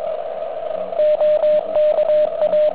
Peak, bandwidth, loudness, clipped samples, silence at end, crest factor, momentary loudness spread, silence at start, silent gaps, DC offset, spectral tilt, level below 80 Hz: -8 dBFS; 4 kHz; -18 LUFS; under 0.1%; 0 s; 8 dB; 10 LU; 0 s; none; 1%; -7.5 dB/octave; -58 dBFS